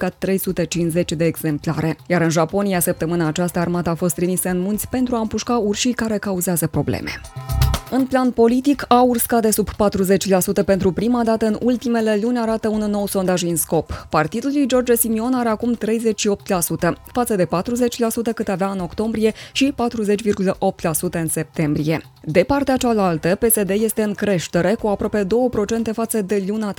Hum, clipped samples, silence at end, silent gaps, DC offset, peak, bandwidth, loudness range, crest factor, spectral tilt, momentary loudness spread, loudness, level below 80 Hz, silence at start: none; under 0.1%; 0.05 s; none; under 0.1%; 0 dBFS; 19 kHz; 3 LU; 18 dB; -5 dB/octave; 5 LU; -19 LUFS; -38 dBFS; 0 s